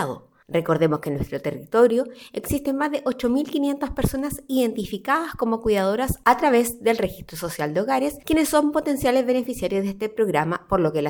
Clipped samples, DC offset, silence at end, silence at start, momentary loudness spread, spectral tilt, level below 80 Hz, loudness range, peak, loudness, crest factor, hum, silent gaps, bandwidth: under 0.1%; under 0.1%; 0 s; 0 s; 9 LU; -5.5 dB/octave; -44 dBFS; 2 LU; -2 dBFS; -23 LUFS; 20 dB; none; none; 19 kHz